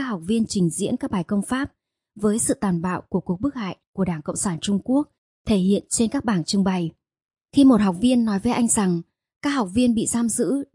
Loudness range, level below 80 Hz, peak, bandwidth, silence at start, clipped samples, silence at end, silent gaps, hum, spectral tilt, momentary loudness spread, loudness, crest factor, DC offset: 5 LU; -52 dBFS; -6 dBFS; 11.5 kHz; 0 s; under 0.1%; 0.1 s; 3.87-3.93 s, 5.18-5.45 s, 7.25-7.29 s, 9.36-9.40 s; none; -5 dB/octave; 8 LU; -22 LUFS; 16 dB; under 0.1%